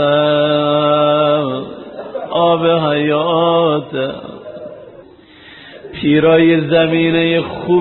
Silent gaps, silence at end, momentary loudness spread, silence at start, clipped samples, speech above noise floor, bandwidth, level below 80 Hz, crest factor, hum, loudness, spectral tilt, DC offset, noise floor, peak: none; 0 s; 19 LU; 0 s; under 0.1%; 28 dB; 4.2 kHz; -52 dBFS; 14 dB; none; -14 LUFS; -4.5 dB/octave; under 0.1%; -41 dBFS; 0 dBFS